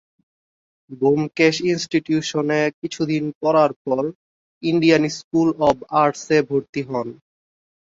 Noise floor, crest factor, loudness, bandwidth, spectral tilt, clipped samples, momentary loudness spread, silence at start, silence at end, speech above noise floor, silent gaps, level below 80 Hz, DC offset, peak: under -90 dBFS; 18 dB; -20 LUFS; 7.8 kHz; -5.5 dB/octave; under 0.1%; 9 LU; 0.9 s; 0.8 s; over 71 dB; 2.74-2.82 s, 3.35-3.41 s, 3.76-3.85 s, 4.15-4.61 s, 5.24-5.31 s, 6.69-6.73 s; -58 dBFS; under 0.1%; -2 dBFS